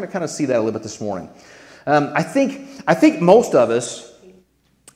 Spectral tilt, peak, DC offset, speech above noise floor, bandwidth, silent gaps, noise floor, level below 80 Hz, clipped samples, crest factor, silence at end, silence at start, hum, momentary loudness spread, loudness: -5.5 dB/octave; 0 dBFS; under 0.1%; 40 dB; 14.5 kHz; none; -57 dBFS; -62 dBFS; under 0.1%; 18 dB; 0.9 s; 0 s; none; 16 LU; -18 LUFS